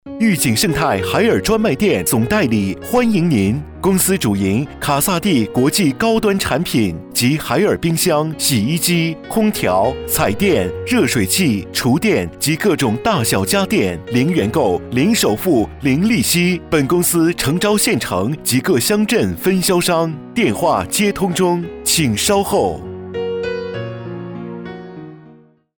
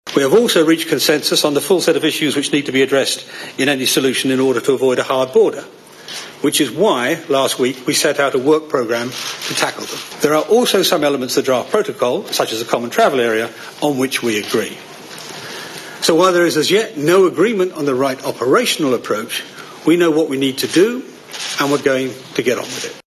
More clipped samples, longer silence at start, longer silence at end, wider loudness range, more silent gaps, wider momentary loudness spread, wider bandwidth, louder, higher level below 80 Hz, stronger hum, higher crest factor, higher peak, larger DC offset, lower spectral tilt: neither; about the same, 0.05 s vs 0.05 s; first, 0.45 s vs 0.05 s; about the same, 1 LU vs 3 LU; neither; second, 5 LU vs 12 LU; first, over 20 kHz vs 13.5 kHz; about the same, -16 LUFS vs -16 LUFS; first, -40 dBFS vs -64 dBFS; neither; about the same, 14 dB vs 16 dB; about the same, -2 dBFS vs 0 dBFS; neither; about the same, -4.5 dB/octave vs -3.5 dB/octave